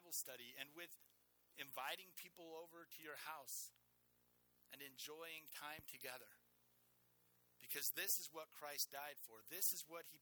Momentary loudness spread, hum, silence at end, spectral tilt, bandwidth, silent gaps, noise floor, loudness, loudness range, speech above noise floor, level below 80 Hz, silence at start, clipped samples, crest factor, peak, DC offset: 17 LU; 60 Hz at -90 dBFS; 0.05 s; 0 dB/octave; over 20 kHz; none; -79 dBFS; -48 LUFS; 11 LU; 28 dB; under -90 dBFS; 0 s; under 0.1%; 26 dB; -26 dBFS; under 0.1%